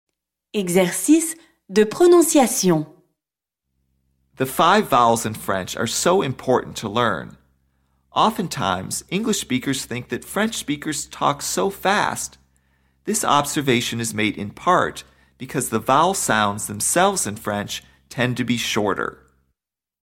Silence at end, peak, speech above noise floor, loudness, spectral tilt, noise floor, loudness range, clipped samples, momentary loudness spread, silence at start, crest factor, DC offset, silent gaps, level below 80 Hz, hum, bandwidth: 0.95 s; -4 dBFS; 67 dB; -20 LUFS; -3.5 dB/octave; -87 dBFS; 5 LU; under 0.1%; 11 LU; 0.55 s; 18 dB; under 0.1%; none; -54 dBFS; none; 17 kHz